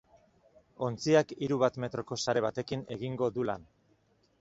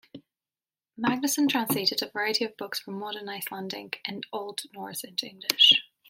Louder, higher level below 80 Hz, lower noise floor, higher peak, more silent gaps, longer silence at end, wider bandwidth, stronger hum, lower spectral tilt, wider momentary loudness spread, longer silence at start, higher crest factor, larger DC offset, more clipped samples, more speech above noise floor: second, -32 LUFS vs -26 LUFS; first, -66 dBFS vs -76 dBFS; second, -69 dBFS vs under -90 dBFS; second, -12 dBFS vs -2 dBFS; neither; first, 0.8 s vs 0.25 s; second, 8 kHz vs 16.5 kHz; neither; first, -5.5 dB/octave vs -2 dB/octave; second, 11 LU vs 18 LU; first, 0.8 s vs 0.15 s; second, 20 dB vs 26 dB; neither; neither; second, 38 dB vs over 62 dB